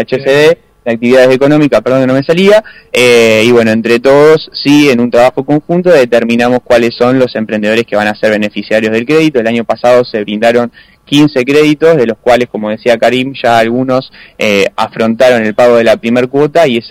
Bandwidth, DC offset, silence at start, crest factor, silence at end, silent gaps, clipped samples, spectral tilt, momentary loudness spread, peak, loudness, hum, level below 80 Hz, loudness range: 16 kHz; under 0.1%; 0 s; 8 dB; 0 s; none; 0.3%; -5.5 dB/octave; 7 LU; 0 dBFS; -8 LUFS; none; -46 dBFS; 3 LU